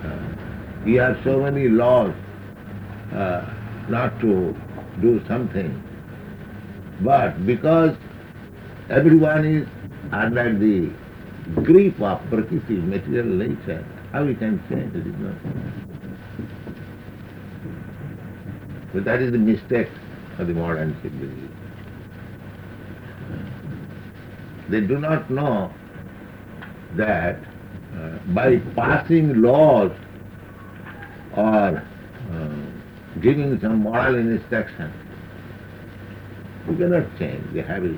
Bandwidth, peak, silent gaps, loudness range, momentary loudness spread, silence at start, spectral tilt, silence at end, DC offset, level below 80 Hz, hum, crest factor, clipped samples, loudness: over 20 kHz; -2 dBFS; none; 11 LU; 21 LU; 0 s; -9.5 dB/octave; 0 s; under 0.1%; -48 dBFS; none; 20 dB; under 0.1%; -21 LUFS